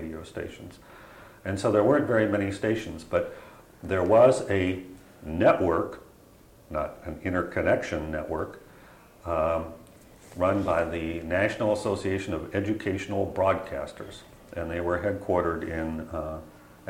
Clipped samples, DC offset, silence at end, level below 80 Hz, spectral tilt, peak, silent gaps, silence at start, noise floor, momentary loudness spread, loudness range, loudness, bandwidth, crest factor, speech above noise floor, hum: under 0.1%; under 0.1%; 0 s; -50 dBFS; -6.5 dB/octave; -6 dBFS; none; 0 s; -54 dBFS; 19 LU; 5 LU; -27 LUFS; 16.5 kHz; 20 dB; 27 dB; none